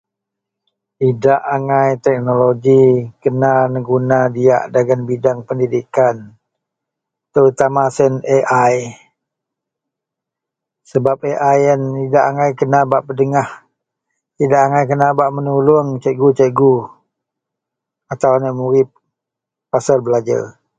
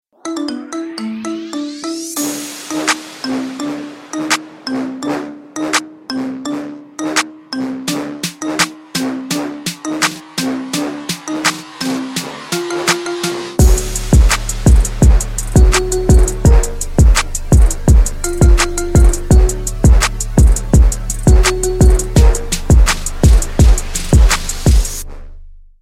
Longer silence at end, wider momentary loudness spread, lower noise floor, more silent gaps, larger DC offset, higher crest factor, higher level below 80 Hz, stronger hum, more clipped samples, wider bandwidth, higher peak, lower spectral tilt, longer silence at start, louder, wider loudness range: about the same, 0.3 s vs 0.25 s; second, 7 LU vs 11 LU; first, -83 dBFS vs -34 dBFS; neither; neither; about the same, 16 dB vs 12 dB; second, -56 dBFS vs -14 dBFS; neither; neither; second, 9 kHz vs 16 kHz; about the same, 0 dBFS vs 0 dBFS; first, -7.5 dB/octave vs -4.5 dB/octave; first, 1 s vs 0.25 s; about the same, -14 LUFS vs -15 LUFS; second, 5 LU vs 8 LU